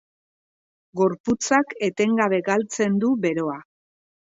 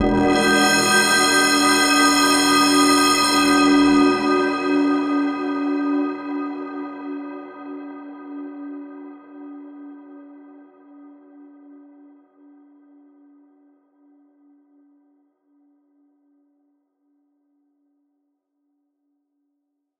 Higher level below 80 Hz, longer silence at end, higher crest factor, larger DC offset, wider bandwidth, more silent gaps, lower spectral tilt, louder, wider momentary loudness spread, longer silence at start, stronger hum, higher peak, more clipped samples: second, -64 dBFS vs -50 dBFS; second, 0.6 s vs 9.65 s; about the same, 18 dB vs 18 dB; neither; second, 8 kHz vs 15.5 kHz; first, 1.20-1.24 s vs none; first, -5 dB/octave vs -2.5 dB/octave; second, -22 LUFS vs -17 LUFS; second, 7 LU vs 23 LU; first, 0.95 s vs 0 s; neither; about the same, -6 dBFS vs -4 dBFS; neither